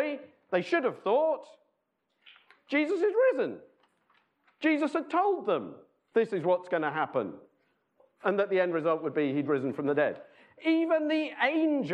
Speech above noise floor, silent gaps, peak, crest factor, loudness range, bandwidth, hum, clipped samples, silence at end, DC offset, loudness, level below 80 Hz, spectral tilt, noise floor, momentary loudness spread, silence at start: 51 dB; none; -12 dBFS; 18 dB; 3 LU; 9 kHz; none; under 0.1%; 0 s; under 0.1%; -29 LUFS; -86 dBFS; -7 dB/octave; -79 dBFS; 8 LU; 0 s